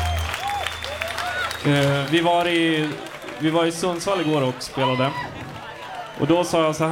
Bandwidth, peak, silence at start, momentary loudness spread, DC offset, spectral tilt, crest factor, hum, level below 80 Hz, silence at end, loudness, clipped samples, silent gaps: 19 kHz; -6 dBFS; 0 s; 14 LU; under 0.1%; -5 dB/octave; 18 dB; none; -42 dBFS; 0 s; -22 LUFS; under 0.1%; none